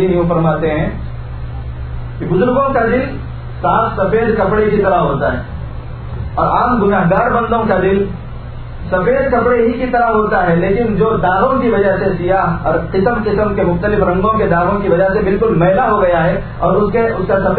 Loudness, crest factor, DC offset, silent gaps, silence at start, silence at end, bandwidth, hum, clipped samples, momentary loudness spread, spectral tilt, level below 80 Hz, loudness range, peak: -14 LUFS; 14 dB; under 0.1%; none; 0 s; 0 s; 4.5 kHz; none; under 0.1%; 13 LU; -12 dB/octave; -28 dBFS; 3 LU; 0 dBFS